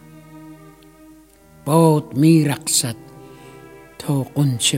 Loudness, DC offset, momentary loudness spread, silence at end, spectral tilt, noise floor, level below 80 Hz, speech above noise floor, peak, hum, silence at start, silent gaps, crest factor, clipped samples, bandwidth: -17 LUFS; under 0.1%; 16 LU; 0 s; -5 dB/octave; -48 dBFS; -56 dBFS; 31 dB; -2 dBFS; none; 0.35 s; none; 18 dB; under 0.1%; 16.5 kHz